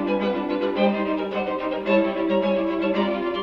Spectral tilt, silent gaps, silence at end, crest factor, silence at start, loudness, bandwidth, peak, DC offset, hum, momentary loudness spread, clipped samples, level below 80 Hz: -8 dB/octave; none; 0 s; 16 dB; 0 s; -23 LUFS; 6 kHz; -8 dBFS; under 0.1%; none; 5 LU; under 0.1%; -54 dBFS